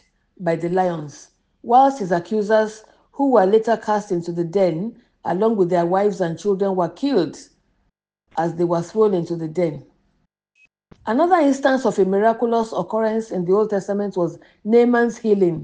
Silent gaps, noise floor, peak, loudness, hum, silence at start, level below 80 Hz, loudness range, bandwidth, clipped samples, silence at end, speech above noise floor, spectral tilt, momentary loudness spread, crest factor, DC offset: none; -70 dBFS; -2 dBFS; -19 LUFS; none; 0.4 s; -62 dBFS; 4 LU; 9.4 kHz; under 0.1%; 0 s; 51 dB; -7 dB/octave; 10 LU; 16 dB; under 0.1%